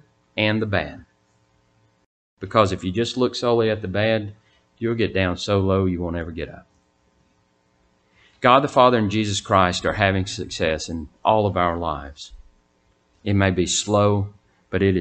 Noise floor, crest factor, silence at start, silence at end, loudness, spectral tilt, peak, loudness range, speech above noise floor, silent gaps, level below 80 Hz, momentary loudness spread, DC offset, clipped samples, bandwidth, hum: -64 dBFS; 22 dB; 0.35 s; 0 s; -21 LUFS; -5 dB/octave; 0 dBFS; 5 LU; 43 dB; 2.06-2.37 s; -46 dBFS; 15 LU; under 0.1%; under 0.1%; 9.2 kHz; none